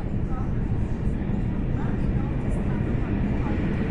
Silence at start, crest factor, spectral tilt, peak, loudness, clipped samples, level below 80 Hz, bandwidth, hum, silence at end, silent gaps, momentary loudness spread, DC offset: 0 s; 12 dB; -9.5 dB/octave; -12 dBFS; -27 LUFS; under 0.1%; -30 dBFS; 10 kHz; none; 0 s; none; 2 LU; under 0.1%